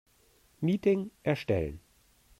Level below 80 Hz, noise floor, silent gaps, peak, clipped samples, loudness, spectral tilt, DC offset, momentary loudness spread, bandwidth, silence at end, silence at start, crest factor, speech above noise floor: -54 dBFS; -65 dBFS; none; -14 dBFS; under 0.1%; -31 LUFS; -8 dB/octave; under 0.1%; 9 LU; 15 kHz; 0.6 s; 0.6 s; 18 dB; 36 dB